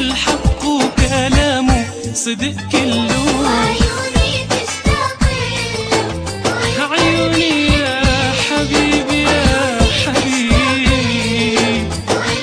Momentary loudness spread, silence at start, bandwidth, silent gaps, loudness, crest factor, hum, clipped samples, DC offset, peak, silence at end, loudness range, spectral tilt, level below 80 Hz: 5 LU; 0 s; 14 kHz; none; -15 LUFS; 14 dB; none; under 0.1%; under 0.1%; 0 dBFS; 0 s; 3 LU; -4 dB/octave; -24 dBFS